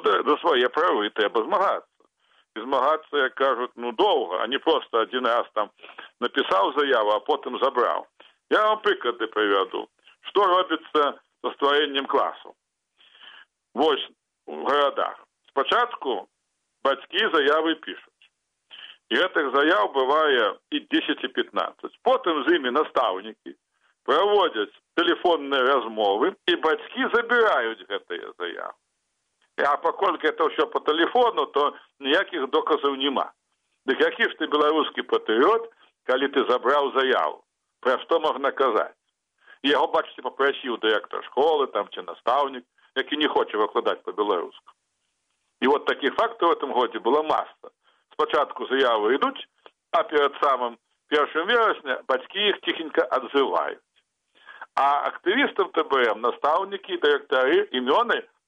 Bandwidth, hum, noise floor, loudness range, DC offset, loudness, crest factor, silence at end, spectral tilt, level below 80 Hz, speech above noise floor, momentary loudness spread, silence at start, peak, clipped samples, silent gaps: 8.2 kHz; none; -77 dBFS; 3 LU; under 0.1%; -23 LUFS; 16 dB; 0.25 s; -4 dB/octave; -74 dBFS; 54 dB; 11 LU; 0 s; -8 dBFS; under 0.1%; none